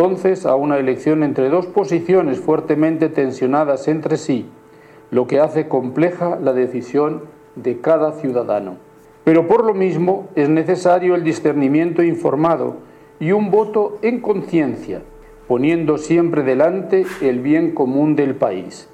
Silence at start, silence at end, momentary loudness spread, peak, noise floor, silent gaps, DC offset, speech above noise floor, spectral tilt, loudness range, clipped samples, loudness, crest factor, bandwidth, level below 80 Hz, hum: 0 s; 0.1 s; 7 LU; -4 dBFS; -44 dBFS; none; under 0.1%; 28 dB; -7.5 dB/octave; 3 LU; under 0.1%; -17 LUFS; 14 dB; 9.4 kHz; -56 dBFS; none